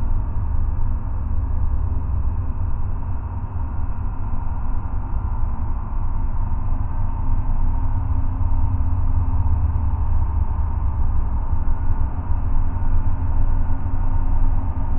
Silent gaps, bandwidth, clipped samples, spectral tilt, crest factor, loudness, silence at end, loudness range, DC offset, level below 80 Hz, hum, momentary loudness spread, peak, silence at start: none; 2 kHz; under 0.1%; -12.5 dB/octave; 12 dB; -25 LUFS; 0 s; 4 LU; under 0.1%; -20 dBFS; none; 5 LU; -6 dBFS; 0 s